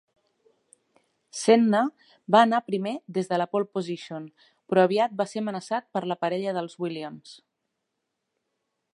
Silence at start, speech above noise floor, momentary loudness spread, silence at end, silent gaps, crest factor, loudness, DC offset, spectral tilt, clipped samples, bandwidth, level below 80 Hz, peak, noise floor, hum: 1.35 s; 56 dB; 19 LU; 1.6 s; none; 22 dB; -25 LUFS; under 0.1%; -5.5 dB/octave; under 0.1%; 11.5 kHz; -80 dBFS; -4 dBFS; -81 dBFS; none